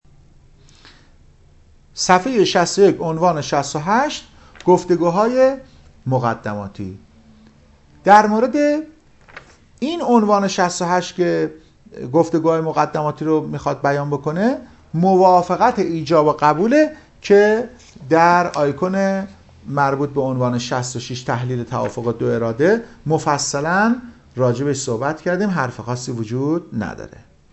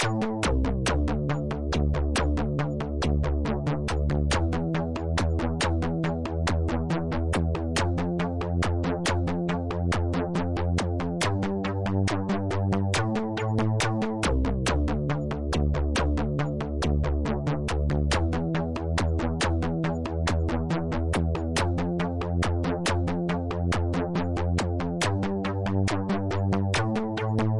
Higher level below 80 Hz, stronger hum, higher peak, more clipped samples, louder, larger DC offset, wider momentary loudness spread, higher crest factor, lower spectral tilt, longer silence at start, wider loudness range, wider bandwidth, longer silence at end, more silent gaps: second, -52 dBFS vs -34 dBFS; neither; first, 0 dBFS vs -10 dBFS; neither; first, -18 LUFS vs -27 LUFS; neither; first, 13 LU vs 3 LU; about the same, 18 dB vs 16 dB; about the same, -5.5 dB/octave vs -6 dB/octave; first, 1.95 s vs 0 s; first, 5 LU vs 1 LU; second, 8.4 kHz vs 11.5 kHz; first, 0.45 s vs 0 s; neither